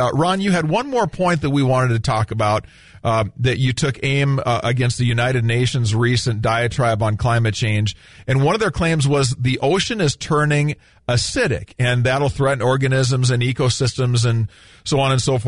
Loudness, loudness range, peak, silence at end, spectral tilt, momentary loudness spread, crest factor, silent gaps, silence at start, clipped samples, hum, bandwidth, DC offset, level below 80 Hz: -18 LUFS; 1 LU; -6 dBFS; 0 s; -5.5 dB/octave; 4 LU; 12 dB; none; 0 s; under 0.1%; none; 11 kHz; 0.4%; -42 dBFS